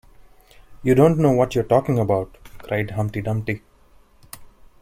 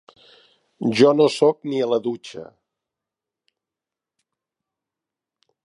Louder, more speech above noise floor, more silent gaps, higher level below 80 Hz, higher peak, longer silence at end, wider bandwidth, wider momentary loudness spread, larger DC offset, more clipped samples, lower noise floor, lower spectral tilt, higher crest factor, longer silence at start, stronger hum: about the same, -20 LUFS vs -19 LUFS; second, 34 dB vs 69 dB; neither; first, -46 dBFS vs -74 dBFS; about the same, -2 dBFS vs -2 dBFS; second, 0.35 s vs 3.2 s; first, 16 kHz vs 11 kHz; first, 24 LU vs 19 LU; neither; neither; second, -52 dBFS vs -88 dBFS; first, -8 dB/octave vs -5.5 dB/octave; about the same, 20 dB vs 22 dB; about the same, 0.7 s vs 0.8 s; neither